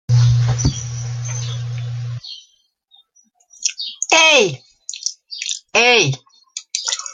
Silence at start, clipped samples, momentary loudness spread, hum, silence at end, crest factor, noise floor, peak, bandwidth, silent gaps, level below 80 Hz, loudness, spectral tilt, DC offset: 0.1 s; under 0.1%; 19 LU; none; 0 s; 18 dB; -58 dBFS; 0 dBFS; 9.4 kHz; none; -40 dBFS; -17 LUFS; -3 dB/octave; under 0.1%